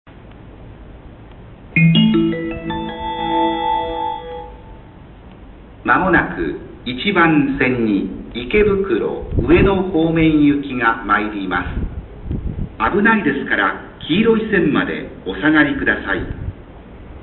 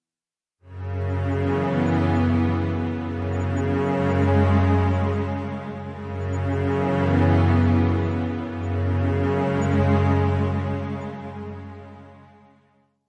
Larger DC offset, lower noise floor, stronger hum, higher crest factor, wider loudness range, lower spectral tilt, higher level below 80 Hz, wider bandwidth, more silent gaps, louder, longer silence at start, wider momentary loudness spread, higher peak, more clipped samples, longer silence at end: neither; second, -39 dBFS vs under -90 dBFS; neither; about the same, 16 dB vs 14 dB; about the same, 5 LU vs 3 LU; first, -11.5 dB/octave vs -9 dB/octave; first, -34 dBFS vs -56 dBFS; second, 4.3 kHz vs 7.4 kHz; neither; first, -17 LUFS vs -23 LUFS; second, 0.05 s vs 0.65 s; about the same, 14 LU vs 14 LU; first, -2 dBFS vs -8 dBFS; neither; second, 0 s vs 0.9 s